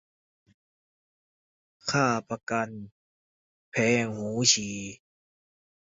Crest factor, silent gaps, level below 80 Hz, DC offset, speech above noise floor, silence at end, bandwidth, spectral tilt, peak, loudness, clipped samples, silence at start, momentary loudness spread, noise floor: 24 dB; 2.43-2.47 s, 2.92-3.72 s; -66 dBFS; under 0.1%; over 63 dB; 1 s; 8 kHz; -3 dB/octave; -8 dBFS; -26 LUFS; under 0.1%; 1.85 s; 15 LU; under -90 dBFS